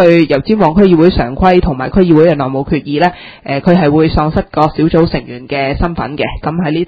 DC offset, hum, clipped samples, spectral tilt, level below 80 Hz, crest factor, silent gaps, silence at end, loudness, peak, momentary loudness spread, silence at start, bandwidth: under 0.1%; none; 0.7%; -9 dB/octave; -26 dBFS; 10 dB; none; 0 s; -11 LUFS; 0 dBFS; 9 LU; 0 s; 6.2 kHz